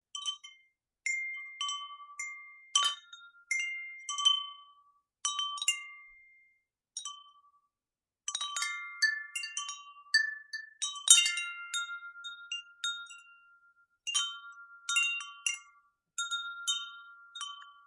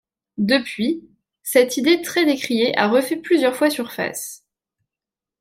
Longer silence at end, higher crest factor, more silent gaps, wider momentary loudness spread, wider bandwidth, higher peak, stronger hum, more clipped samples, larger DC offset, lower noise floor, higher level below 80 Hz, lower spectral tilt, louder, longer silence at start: second, 0.15 s vs 1.05 s; first, 32 dB vs 18 dB; neither; first, 17 LU vs 12 LU; second, 11.5 kHz vs 16.5 kHz; about the same, -4 dBFS vs -2 dBFS; neither; neither; neither; about the same, under -90 dBFS vs -89 dBFS; second, under -90 dBFS vs -66 dBFS; second, 8.5 dB/octave vs -3.5 dB/octave; second, -32 LUFS vs -19 LUFS; second, 0.15 s vs 0.4 s